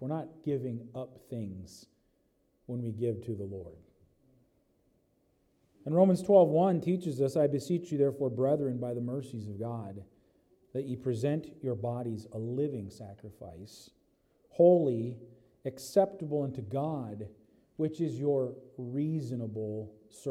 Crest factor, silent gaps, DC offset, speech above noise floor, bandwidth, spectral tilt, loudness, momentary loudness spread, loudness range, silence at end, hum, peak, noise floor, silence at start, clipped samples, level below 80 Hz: 22 dB; none; under 0.1%; 42 dB; 15 kHz; -8.5 dB/octave; -32 LUFS; 20 LU; 12 LU; 0 s; none; -10 dBFS; -73 dBFS; 0 s; under 0.1%; -70 dBFS